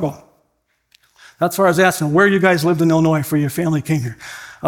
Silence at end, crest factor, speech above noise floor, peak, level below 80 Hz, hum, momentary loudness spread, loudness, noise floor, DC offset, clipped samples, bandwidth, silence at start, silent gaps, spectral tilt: 0 s; 16 dB; 51 dB; 0 dBFS; -54 dBFS; none; 12 LU; -16 LUFS; -67 dBFS; under 0.1%; under 0.1%; 18 kHz; 0 s; none; -6 dB/octave